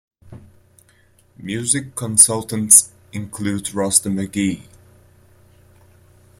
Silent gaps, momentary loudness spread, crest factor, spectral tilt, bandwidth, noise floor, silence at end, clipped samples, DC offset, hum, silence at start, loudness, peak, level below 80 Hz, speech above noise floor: none; 20 LU; 22 dB; -3 dB/octave; 16.5 kHz; -55 dBFS; 1.75 s; under 0.1%; under 0.1%; none; 0.25 s; -15 LUFS; 0 dBFS; -56 dBFS; 37 dB